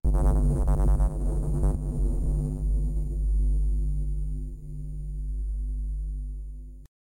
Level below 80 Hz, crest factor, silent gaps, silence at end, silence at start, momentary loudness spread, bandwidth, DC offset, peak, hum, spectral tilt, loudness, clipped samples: -26 dBFS; 10 dB; none; 0.25 s; 0.05 s; 13 LU; 10.5 kHz; under 0.1%; -14 dBFS; none; -9.5 dB/octave; -29 LUFS; under 0.1%